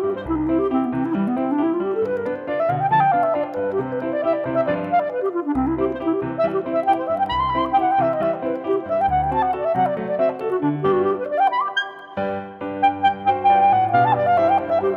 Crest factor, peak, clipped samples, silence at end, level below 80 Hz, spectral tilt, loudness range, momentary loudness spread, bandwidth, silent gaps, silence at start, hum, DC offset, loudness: 14 dB; -6 dBFS; under 0.1%; 0 s; -46 dBFS; -8 dB/octave; 2 LU; 7 LU; 6.8 kHz; none; 0 s; none; under 0.1%; -20 LUFS